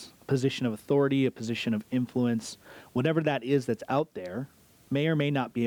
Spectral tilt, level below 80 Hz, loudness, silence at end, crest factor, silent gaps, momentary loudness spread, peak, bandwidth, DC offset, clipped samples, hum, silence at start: -6.5 dB/octave; -68 dBFS; -29 LUFS; 0 s; 14 dB; none; 11 LU; -14 dBFS; 19.5 kHz; under 0.1%; under 0.1%; none; 0 s